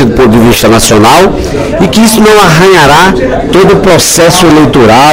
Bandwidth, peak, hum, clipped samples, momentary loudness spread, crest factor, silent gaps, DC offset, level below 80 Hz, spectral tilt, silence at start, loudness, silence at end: over 20 kHz; 0 dBFS; none; 10%; 5 LU; 2 dB; none; under 0.1%; -22 dBFS; -4.5 dB/octave; 0 s; -3 LUFS; 0 s